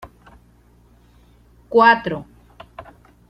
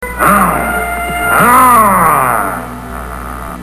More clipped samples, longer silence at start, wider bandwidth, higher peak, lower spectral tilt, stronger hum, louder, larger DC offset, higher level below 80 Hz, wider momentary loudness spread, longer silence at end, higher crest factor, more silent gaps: second, under 0.1% vs 0.3%; about the same, 0.05 s vs 0 s; second, 8.6 kHz vs 14.5 kHz; about the same, -2 dBFS vs 0 dBFS; first, -6.5 dB/octave vs -4.5 dB/octave; second, none vs 60 Hz at -30 dBFS; second, -16 LUFS vs -9 LUFS; second, under 0.1% vs 0.5%; second, -52 dBFS vs -28 dBFS; first, 28 LU vs 18 LU; first, 0.5 s vs 0 s; first, 22 dB vs 10 dB; neither